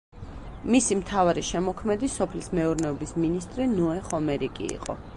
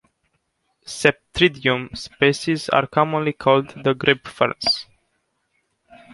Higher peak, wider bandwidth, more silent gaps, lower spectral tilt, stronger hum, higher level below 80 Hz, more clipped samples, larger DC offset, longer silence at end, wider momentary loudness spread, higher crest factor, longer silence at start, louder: second, -10 dBFS vs -2 dBFS; about the same, 11.5 kHz vs 11.5 kHz; neither; about the same, -5 dB/octave vs -4.5 dB/octave; neither; first, -44 dBFS vs -52 dBFS; neither; neither; second, 0 s vs 1.3 s; first, 10 LU vs 5 LU; about the same, 18 dB vs 20 dB; second, 0.15 s vs 0.85 s; second, -27 LUFS vs -20 LUFS